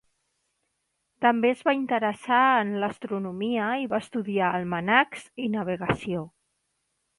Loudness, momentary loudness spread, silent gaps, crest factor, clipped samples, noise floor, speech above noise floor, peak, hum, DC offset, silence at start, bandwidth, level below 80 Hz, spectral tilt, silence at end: -25 LUFS; 10 LU; none; 22 dB; under 0.1%; -77 dBFS; 52 dB; -6 dBFS; none; under 0.1%; 1.2 s; 11.5 kHz; -62 dBFS; -6 dB/octave; 0.9 s